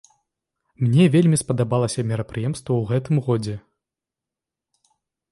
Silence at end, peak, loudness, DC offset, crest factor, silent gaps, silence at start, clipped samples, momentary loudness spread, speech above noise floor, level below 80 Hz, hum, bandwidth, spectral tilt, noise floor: 1.7 s; -6 dBFS; -21 LUFS; under 0.1%; 16 dB; none; 0.8 s; under 0.1%; 11 LU; 68 dB; -54 dBFS; none; 11.5 kHz; -6.5 dB/octave; -87 dBFS